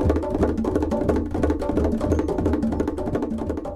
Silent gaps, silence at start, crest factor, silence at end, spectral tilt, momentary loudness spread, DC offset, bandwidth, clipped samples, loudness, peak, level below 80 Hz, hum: none; 0 s; 14 dB; 0 s; -8.5 dB/octave; 4 LU; under 0.1%; 12 kHz; under 0.1%; -24 LUFS; -8 dBFS; -30 dBFS; none